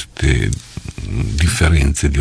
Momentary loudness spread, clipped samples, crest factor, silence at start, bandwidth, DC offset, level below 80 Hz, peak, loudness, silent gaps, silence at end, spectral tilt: 13 LU; under 0.1%; 14 dB; 0 s; 11 kHz; under 0.1%; -20 dBFS; -2 dBFS; -17 LUFS; none; 0 s; -5 dB/octave